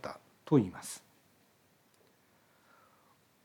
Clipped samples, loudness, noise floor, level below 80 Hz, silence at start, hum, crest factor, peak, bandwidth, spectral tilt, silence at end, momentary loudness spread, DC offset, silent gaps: under 0.1%; -33 LUFS; -69 dBFS; -80 dBFS; 0.05 s; none; 24 dB; -14 dBFS; 19.5 kHz; -6.5 dB/octave; 2.45 s; 19 LU; under 0.1%; none